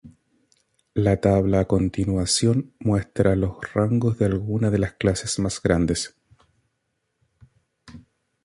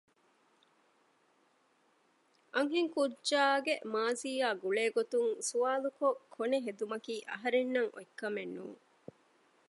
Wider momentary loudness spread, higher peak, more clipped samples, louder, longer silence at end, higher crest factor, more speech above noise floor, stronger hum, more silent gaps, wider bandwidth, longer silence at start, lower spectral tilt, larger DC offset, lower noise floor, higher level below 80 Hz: second, 5 LU vs 10 LU; first, -4 dBFS vs -16 dBFS; neither; first, -22 LUFS vs -34 LUFS; second, 0.45 s vs 0.95 s; about the same, 20 dB vs 20 dB; first, 54 dB vs 38 dB; neither; neither; about the same, 11.5 kHz vs 11.5 kHz; second, 0.05 s vs 2.55 s; first, -5.5 dB/octave vs -2.5 dB/octave; neither; about the same, -75 dBFS vs -72 dBFS; first, -40 dBFS vs under -90 dBFS